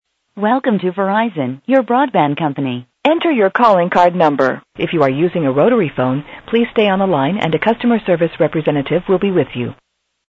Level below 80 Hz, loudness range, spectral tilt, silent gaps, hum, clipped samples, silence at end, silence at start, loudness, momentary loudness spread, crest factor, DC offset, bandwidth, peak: -52 dBFS; 2 LU; -8 dB/octave; none; none; under 0.1%; 0.55 s; 0.35 s; -15 LUFS; 8 LU; 14 dB; under 0.1%; 7.8 kHz; 0 dBFS